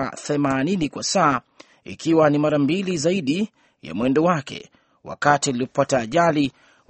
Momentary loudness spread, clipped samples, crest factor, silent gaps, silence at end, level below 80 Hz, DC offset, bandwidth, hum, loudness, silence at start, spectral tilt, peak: 11 LU; under 0.1%; 20 dB; none; 0.4 s; -56 dBFS; under 0.1%; 8.8 kHz; none; -21 LUFS; 0 s; -5 dB/octave; -2 dBFS